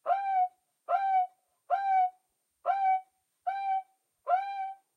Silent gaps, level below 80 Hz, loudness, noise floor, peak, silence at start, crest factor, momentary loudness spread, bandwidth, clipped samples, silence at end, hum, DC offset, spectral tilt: none; under -90 dBFS; -31 LUFS; -73 dBFS; -16 dBFS; 0.05 s; 14 dB; 10 LU; 4.9 kHz; under 0.1%; 0.2 s; none; under 0.1%; 0 dB/octave